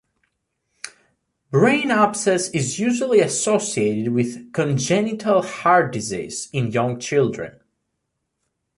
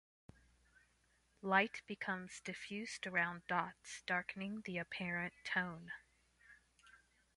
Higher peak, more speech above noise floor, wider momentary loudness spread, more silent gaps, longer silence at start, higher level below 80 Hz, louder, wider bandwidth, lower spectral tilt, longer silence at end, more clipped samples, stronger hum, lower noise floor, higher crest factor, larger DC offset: first, -2 dBFS vs -18 dBFS; first, 57 dB vs 35 dB; second, 10 LU vs 13 LU; neither; second, 0.85 s vs 1.45 s; first, -60 dBFS vs -76 dBFS; first, -20 LUFS vs -41 LUFS; about the same, 11.5 kHz vs 11.5 kHz; about the same, -5 dB/octave vs -4.5 dB/octave; first, 1.3 s vs 0.4 s; neither; second, none vs 60 Hz at -70 dBFS; about the same, -76 dBFS vs -76 dBFS; second, 18 dB vs 26 dB; neither